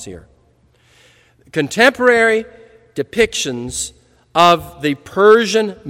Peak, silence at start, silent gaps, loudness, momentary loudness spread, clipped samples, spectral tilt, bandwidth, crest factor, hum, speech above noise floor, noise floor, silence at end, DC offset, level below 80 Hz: 0 dBFS; 0 s; none; -14 LUFS; 14 LU; 0.2%; -3.5 dB/octave; 16.5 kHz; 16 dB; none; 40 dB; -55 dBFS; 0 s; under 0.1%; -48 dBFS